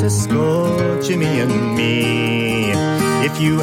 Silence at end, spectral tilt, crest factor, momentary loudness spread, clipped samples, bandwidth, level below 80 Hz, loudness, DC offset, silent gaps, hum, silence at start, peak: 0 s; -5.5 dB/octave; 12 dB; 1 LU; under 0.1%; 16.5 kHz; -46 dBFS; -17 LUFS; under 0.1%; none; none; 0 s; -4 dBFS